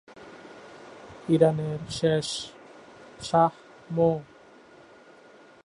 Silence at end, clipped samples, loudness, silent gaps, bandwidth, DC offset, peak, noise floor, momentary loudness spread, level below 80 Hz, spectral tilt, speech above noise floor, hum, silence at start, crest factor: 1.4 s; under 0.1%; -26 LUFS; none; 11 kHz; under 0.1%; -6 dBFS; -53 dBFS; 24 LU; -60 dBFS; -6 dB/octave; 28 dB; none; 0.1 s; 22 dB